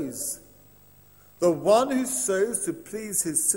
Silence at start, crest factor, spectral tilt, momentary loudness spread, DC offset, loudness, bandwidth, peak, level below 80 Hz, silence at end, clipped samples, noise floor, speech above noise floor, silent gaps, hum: 0 s; 18 dB; -3.5 dB/octave; 11 LU; under 0.1%; -25 LUFS; 16.5 kHz; -8 dBFS; -64 dBFS; 0 s; under 0.1%; -55 dBFS; 30 dB; none; 50 Hz at -60 dBFS